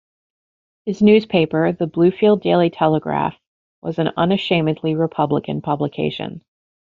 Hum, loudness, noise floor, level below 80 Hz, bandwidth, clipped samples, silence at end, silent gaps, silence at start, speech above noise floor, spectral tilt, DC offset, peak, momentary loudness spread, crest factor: none; -18 LUFS; under -90 dBFS; -56 dBFS; 7 kHz; under 0.1%; 0.6 s; 3.47-3.82 s; 0.85 s; over 73 dB; -5.5 dB/octave; under 0.1%; -2 dBFS; 12 LU; 16 dB